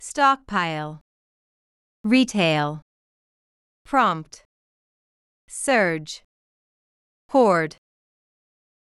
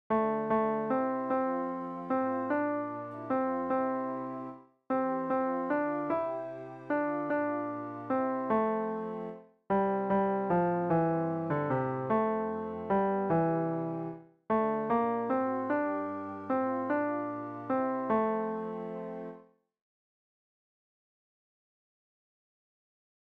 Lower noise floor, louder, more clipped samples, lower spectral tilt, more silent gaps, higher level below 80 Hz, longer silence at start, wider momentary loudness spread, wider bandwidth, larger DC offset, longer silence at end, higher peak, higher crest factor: first, under -90 dBFS vs -56 dBFS; first, -21 LUFS vs -32 LUFS; neither; second, -4.5 dB/octave vs -10.5 dB/octave; first, 1.01-2.04 s, 2.82-3.85 s, 4.45-5.48 s, 6.24-7.29 s vs none; first, -62 dBFS vs -68 dBFS; about the same, 0 s vs 0.1 s; first, 17 LU vs 10 LU; first, 12 kHz vs 4.9 kHz; neither; second, 1.15 s vs 3.85 s; first, -6 dBFS vs -18 dBFS; about the same, 18 dB vs 14 dB